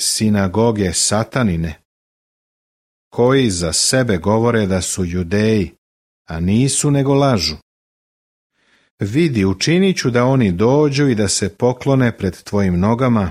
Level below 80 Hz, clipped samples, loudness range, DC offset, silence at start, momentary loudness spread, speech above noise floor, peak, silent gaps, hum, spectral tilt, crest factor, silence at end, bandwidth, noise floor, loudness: -42 dBFS; under 0.1%; 3 LU; under 0.1%; 0 s; 7 LU; over 75 dB; -2 dBFS; 1.85-3.11 s, 5.78-6.25 s, 7.62-8.50 s, 8.91-8.98 s; none; -5 dB/octave; 14 dB; 0 s; 15.5 kHz; under -90 dBFS; -16 LUFS